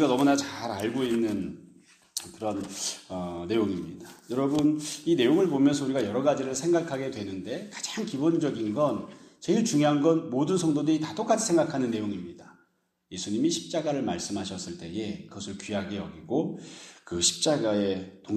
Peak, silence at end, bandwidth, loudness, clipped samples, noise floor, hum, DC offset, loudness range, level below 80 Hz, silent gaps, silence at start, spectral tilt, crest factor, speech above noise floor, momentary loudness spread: -8 dBFS; 0 s; 14.5 kHz; -28 LUFS; under 0.1%; -71 dBFS; none; under 0.1%; 6 LU; -64 dBFS; none; 0 s; -4.5 dB/octave; 20 dB; 43 dB; 14 LU